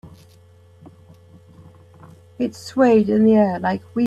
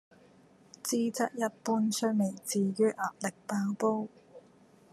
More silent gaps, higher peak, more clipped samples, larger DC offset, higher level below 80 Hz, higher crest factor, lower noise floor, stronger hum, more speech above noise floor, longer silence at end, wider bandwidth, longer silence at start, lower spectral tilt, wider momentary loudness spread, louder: neither; first, -4 dBFS vs -14 dBFS; neither; neither; first, -60 dBFS vs -82 dBFS; about the same, 16 dB vs 18 dB; second, -49 dBFS vs -60 dBFS; neither; about the same, 32 dB vs 30 dB; second, 0 s vs 0.55 s; second, 9.6 kHz vs 13.5 kHz; second, 0.05 s vs 0.85 s; first, -7.5 dB/octave vs -5 dB/octave; first, 12 LU vs 7 LU; first, -18 LUFS vs -31 LUFS